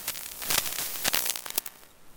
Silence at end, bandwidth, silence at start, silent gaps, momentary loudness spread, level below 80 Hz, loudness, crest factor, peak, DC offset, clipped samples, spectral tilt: 0.05 s; 19 kHz; 0 s; none; 9 LU; -58 dBFS; -28 LUFS; 30 dB; -2 dBFS; under 0.1%; under 0.1%; 0.5 dB/octave